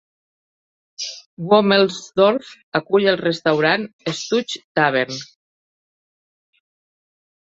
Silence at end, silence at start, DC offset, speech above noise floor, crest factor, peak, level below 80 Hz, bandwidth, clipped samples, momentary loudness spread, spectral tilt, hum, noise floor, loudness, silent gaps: 2.3 s; 1 s; under 0.1%; over 72 dB; 20 dB; 0 dBFS; -66 dBFS; 8 kHz; under 0.1%; 13 LU; -4.5 dB/octave; none; under -90 dBFS; -19 LUFS; 1.26-1.37 s, 2.63-2.72 s, 3.93-3.99 s, 4.64-4.75 s